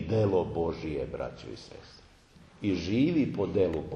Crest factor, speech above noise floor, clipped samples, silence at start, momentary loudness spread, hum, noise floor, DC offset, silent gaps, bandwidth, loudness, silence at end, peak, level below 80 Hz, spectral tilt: 16 dB; 27 dB; under 0.1%; 0 s; 17 LU; none; -56 dBFS; under 0.1%; none; 8.8 kHz; -30 LUFS; 0 s; -14 dBFS; -52 dBFS; -8 dB/octave